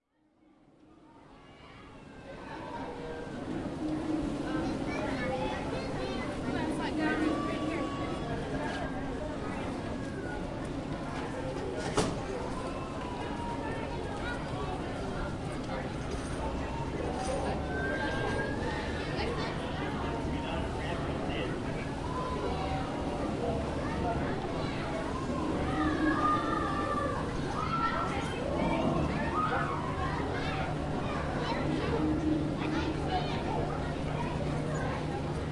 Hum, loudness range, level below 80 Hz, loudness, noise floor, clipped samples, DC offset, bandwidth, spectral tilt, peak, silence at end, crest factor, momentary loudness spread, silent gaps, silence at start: none; 5 LU; -44 dBFS; -34 LUFS; -67 dBFS; under 0.1%; under 0.1%; 11.5 kHz; -6 dB/octave; -14 dBFS; 0 s; 20 dB; 7 LU; none; 0.9 s